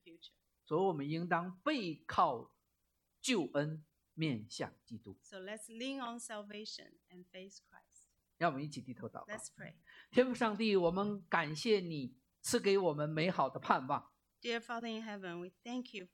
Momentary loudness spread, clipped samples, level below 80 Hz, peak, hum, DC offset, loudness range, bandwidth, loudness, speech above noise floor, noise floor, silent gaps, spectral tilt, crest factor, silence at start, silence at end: 18 LU; under 0.1%; -76 dBFS; -12 dBFS; none; under 0.1%; 10 LU; 17 kHz; -37 LUFS; 45 dB; -83 dBFS; none; -5 dB/octave; 26 dB; 0.05 s; 0.1 s